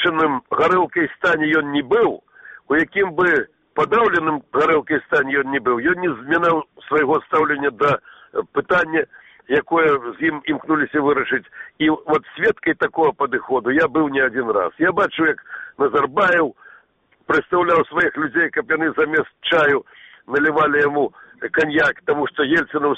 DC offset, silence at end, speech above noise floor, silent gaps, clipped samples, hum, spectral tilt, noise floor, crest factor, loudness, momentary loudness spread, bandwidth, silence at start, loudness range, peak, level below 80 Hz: under 0.1%; 0 s; 40 dB; none; under 0.1%; none; -6.5 dB/octave; -59 dBFS; 14 dB; -18 LUFS; 6 LU; 8.2 kHz; 0 s; 1 LU; -6 dBFS; -56 dBFS